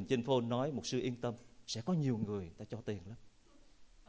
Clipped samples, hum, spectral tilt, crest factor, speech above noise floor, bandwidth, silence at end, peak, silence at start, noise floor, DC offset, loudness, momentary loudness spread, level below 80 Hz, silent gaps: under 0.1%; none; -6 dB/octave; 20 dB; 26 dB; 8 kHz; 0.05 s; -20 dBFS; 0 s; -63 dBFS; under 0.1%; -38 LUFS; 13 LU; -64 dBFS; none